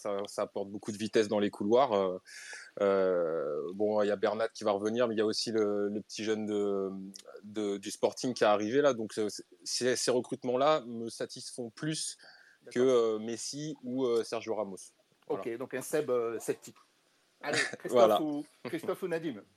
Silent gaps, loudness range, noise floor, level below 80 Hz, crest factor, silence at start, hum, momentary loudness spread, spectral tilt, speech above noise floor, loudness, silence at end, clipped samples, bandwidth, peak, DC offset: none; 4 LU; -70 dBFS; -88 dBFS; 22 dB; 0 s; none; 12 LU; -4 dB/octave; 39 dB; -32 LUFS; 0.15 s; under 0.1%; 15 kHz; -10 dBFS; under 0.1%